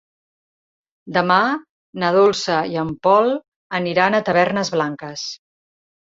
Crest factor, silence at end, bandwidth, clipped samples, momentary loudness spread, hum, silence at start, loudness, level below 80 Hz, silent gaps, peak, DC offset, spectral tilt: 18 dB; 0.7 s; 7.8 kHz; under 0.1%; 13 LU; none; 1.05 s; -19 LUFS; -60 dBFS; 1.69-1.93 s, 3.48-3.70 s; -2 dBFS; under 0.1%; -5 dB/octave